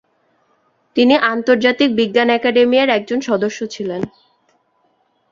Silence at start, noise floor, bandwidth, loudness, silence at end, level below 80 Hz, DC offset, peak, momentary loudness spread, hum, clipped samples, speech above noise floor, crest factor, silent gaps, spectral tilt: 0.95 s; -62 dBFS; 7.4 kHz; -15 LUFS; 1.25 s; -60 dBFS; under 0.1%; -2 dBFS; 11 LU; none; under 0.1%; 47 dB; 16 dB; none; -4.5 dB/octave